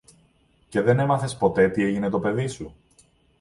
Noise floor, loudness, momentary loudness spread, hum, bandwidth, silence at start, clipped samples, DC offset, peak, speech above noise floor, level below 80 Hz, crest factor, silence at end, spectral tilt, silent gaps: -61 dBFS; -23 LUFS; 10 LU; none; 11.5 kHz; 0.7 s; under 0.1%; under 0.1%; -6 dBFS; 39 dB; -54 dBFS; 18 dB; 0.7 s; -7 dB/octave; none